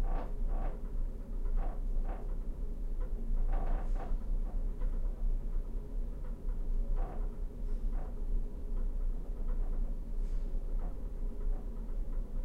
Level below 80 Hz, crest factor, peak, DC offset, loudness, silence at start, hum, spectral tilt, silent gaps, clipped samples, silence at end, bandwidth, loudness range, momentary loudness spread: -34 dBFS; 10 dB; -22 dBFS; under 0.1%; -42 LUFS; 0 s; none; -8.5 dB/octave; none; under 0.1%; 0 s; 2.3 kHz; 2 LU; 4 LU